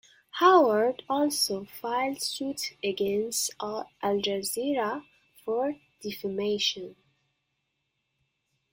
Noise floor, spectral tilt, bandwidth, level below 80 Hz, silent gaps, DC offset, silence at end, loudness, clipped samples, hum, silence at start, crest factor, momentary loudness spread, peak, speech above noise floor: -79 dBFS; -3 dB/octave; 16.5 kHz; -70 dBFS; none; under 0.1%; 1.8 s; -27 LUFS; under 0.1%; none; 0.35 s; 22 dB; 15 LU; -6 dBFS; 52 dB